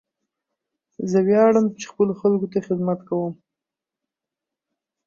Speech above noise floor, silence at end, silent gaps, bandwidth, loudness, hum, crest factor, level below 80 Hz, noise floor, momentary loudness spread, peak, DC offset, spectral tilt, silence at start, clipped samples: 67 dB; 1.75 s; none; 7.4 kHz; -21 LUFS; none; 18 dB; -68 dBFS; -87 dBFS; 11 LU; -6 dBFS; under 0.1%; -7.5 dB/octave; 1 s; under 0.1%